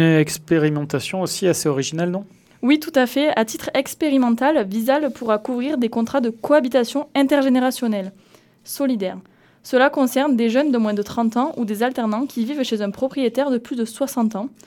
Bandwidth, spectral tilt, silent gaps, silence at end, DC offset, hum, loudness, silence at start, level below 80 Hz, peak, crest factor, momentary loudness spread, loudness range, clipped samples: 19 kHz; -5.5 dB/octave; none; 0.2 s; under 0.1%; none; -20 LUFS; 0 s; -62 dBFS; -4 dBFS; 16 dB; 7 LU; 2 LU; under 0.1%